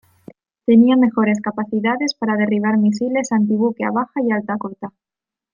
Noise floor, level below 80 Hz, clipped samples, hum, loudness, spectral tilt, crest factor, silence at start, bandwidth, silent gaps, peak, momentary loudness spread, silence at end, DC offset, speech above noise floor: -45 dBFS; -64 dBFS; under 0.1%; none; -18 LUFS; -6 dB/octave; 16 dB; 0.7 s; 7.4 kHz; none; -2 dBFS; 12 LU; 0.65 s; under 0.1%; 28 dB